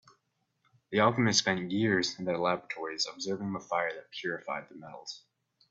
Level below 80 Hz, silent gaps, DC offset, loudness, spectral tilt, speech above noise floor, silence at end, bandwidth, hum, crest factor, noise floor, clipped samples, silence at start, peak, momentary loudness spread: -70 dBFS; none; under 0.1%; -31 LUFS; -4 dB/octave; 46 dB; 0.55 s; 8 kHz; none; 22 dB; -78 dBFS; under 0.1%; 0.9 s; -10 dBFS; 18 LU